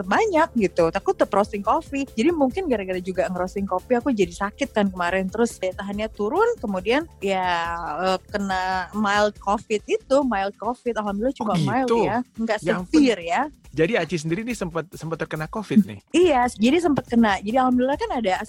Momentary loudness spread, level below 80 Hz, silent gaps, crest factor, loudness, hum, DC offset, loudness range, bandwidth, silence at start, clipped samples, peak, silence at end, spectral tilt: 8 LU; -46 dBFS; none; 16 dB; -23 LUFS; none; under 0.1%; 3 LU; 16.5 kHz; 0 s; under 0.1%; -6 dBFS; 0 s; -5.5 dB/octave